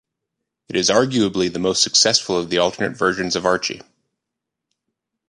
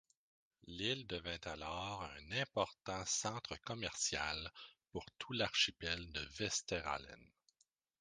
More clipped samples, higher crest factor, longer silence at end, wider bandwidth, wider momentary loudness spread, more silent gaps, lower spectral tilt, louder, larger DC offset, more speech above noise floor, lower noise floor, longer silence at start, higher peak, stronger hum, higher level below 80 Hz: neither; about the same, 20 dB vs 24 dB; first, 1.5 s vs 0.75 s; about the same, 11 kHz vs 10 kHz; second, 8 LU vs 14 LU; neither; about the same, -2.5 dB/octave vs -2 dB/octave; first, -18 LUFS vs -41 LUFS; neither; first, 63 dB vs 38 dB; about the same, -82 dBFS vs -81 dBFS; about the same, 0.7 s vs 0.65 s; first, -2 dBFS vs -18 dBFS; neither; first, -54 dBFS vs -62 dBFS